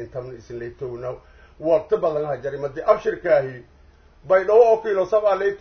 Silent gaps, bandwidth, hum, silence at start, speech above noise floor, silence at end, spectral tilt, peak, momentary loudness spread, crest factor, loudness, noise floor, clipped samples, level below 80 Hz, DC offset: none; 6.6 kHz; none; 0 s; 30 dB; 0.05 s; -7 dB/octave; -2 dBFS; 18 LU; 18 dB; -20 LUFS; -51 dBFS; under 0.1%; -52 dBFS; under 0.1%